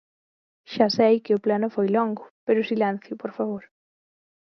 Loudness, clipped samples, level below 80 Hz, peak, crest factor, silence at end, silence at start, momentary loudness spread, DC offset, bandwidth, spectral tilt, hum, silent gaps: -23 LUFS; under 0.1%; -74 dBFS; -4 dBFS; 20 dB; 0.9 s; 0.7 s; 13 LU; under 0.1%; 6.4 kHz; -6.5 dB/octave; none; 2.30-2.47 s